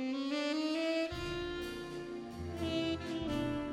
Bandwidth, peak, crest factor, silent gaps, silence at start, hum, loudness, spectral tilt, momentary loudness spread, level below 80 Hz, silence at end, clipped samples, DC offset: 15 kHz; -24 dBFS; 12 dB; none; 0 s; none; -37 LUFS; -5.5 dB/octave; 9 LU; -54 dBFS; 0 s; under 0.1%; under 0.1%